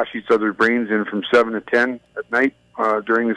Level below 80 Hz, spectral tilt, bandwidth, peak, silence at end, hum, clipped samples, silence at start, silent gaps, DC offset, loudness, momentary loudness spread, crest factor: -64 dBFS; -5.5 dB/octave; 10.5 kHz; -6 dBFS; 0 s; none; under 0.1%; 0 s; none; under 0.1%; -19 LUFS; 5 LU; 14 dB